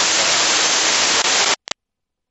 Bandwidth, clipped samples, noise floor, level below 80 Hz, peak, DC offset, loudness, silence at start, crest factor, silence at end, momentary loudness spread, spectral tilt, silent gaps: 8.4 kHz; under 0.1%; -79 dBFS; -56 dBFS; -4 dBFS; under 0.1%; -14 LUFS; 0 s; 14 dB; 0.75 s; 11 LU; 1 dB/octave; none